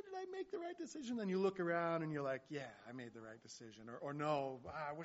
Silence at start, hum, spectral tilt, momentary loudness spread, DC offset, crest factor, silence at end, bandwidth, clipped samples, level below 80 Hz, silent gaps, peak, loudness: 0.05 s; none; -5 dB/octave; 16 LU; under 0.1%; 18 dB; 0 s; 7.6 kHz; under 0.1%; -80 dBFS; none; -26 dBFS; -43 LUFS